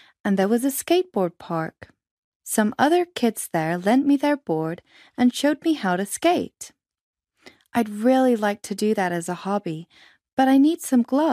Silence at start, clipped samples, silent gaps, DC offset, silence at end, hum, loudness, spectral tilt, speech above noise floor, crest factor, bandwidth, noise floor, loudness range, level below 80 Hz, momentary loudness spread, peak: 0.25 s; under 0.1%; 2.11-2.40 s, 7.01-7.13 s, 10.33-10.37 s; under 0.1%; 0 s; none; -22 LUFS; -5 dB/octave; 31 dB; 18 dB; 15.5 kHz; -53 dBFS; 2 LU; -68 dBFS; 12 LU; -4 dBFS